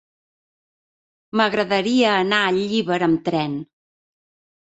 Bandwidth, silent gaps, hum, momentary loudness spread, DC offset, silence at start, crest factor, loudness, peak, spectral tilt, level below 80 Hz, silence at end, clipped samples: 8.2 kHz; none; none; 8 LU; under 0.1%; 1.35 s; 18 dB; -20 LUFS; -4 dBFS; -5 dB/octave; -62 dBFS; 1.05 s; under 0.1%